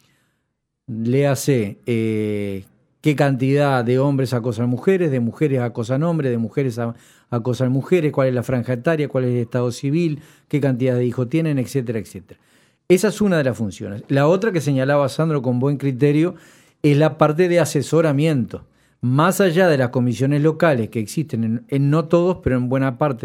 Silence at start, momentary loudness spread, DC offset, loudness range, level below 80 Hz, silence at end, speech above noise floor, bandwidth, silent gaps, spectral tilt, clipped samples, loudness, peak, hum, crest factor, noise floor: 0.9 s; 8 LU; under 0.1%; 3 LU; -52 dBFS; 0.05 s; 56 dB; 16 kHz; none; -7 dB/octave; under 0.1%; -19 LUFS; 0 dBFS; none; 18 dB; -74 dBFS